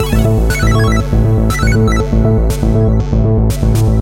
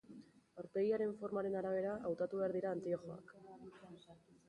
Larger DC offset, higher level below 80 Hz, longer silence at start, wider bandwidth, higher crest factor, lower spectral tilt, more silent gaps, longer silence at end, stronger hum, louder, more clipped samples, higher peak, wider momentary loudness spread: neither; first, -16 dBFS vs -78 dBFS; about the same, 0 s vs 0.1 s; first, 16 kHz vs 10.5 kHz; about the same, 10 dB vs 14 dB; about the same, -7 dB/octave vs -8 dB/octave; neither; second, 0 s vs 0.3 s; neither; first, -12 LUFS vs -40 LUFS; neither; first, 0 dBFS vs -28 dBFS; second, 1 LU vs 21 LU